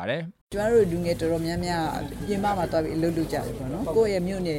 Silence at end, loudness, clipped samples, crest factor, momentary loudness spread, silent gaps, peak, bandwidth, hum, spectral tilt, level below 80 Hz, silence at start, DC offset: 0 s; -26 LUFS; under 0.1%; 16 dB; 9 LU; 0.41-0.47 s; -10 dBFS; 16.5 kHz; none; -6.5 dB/octave; -44 dBFS; 0 s; under 0.1%